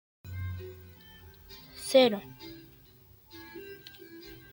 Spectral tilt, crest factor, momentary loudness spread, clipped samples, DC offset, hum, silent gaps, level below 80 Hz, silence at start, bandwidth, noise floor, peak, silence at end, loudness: -4.5 dB/octave; 24 dB; 28 LU; under 0.1%; under 0.1%; none; none; -64 dBFS; 0.25 s; 17 kHz; -58 dBFS; -10 dBFS; 0.15 s; -28 LUFS